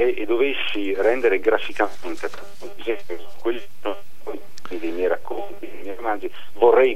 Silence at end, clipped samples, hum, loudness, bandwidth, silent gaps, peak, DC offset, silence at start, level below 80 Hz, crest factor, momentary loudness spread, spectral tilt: 0 s; under 0.1%; none; -23 LUFS; 15.5 kHz; none; -2 dBFS; 7%; 0 s; -60 dBFS; 20 dB; 17 LU; -5 dB/octave